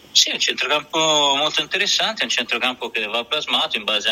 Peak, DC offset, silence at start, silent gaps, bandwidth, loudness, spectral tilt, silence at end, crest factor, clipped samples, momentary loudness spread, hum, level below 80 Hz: 0 dBFS; under 0.1%; 0.15 s; none; 16 kHz; -18 LUFS; 0 dB/octave; 0 s; 20 dB; under 0.1%; 6 LU; none; -64 dBFS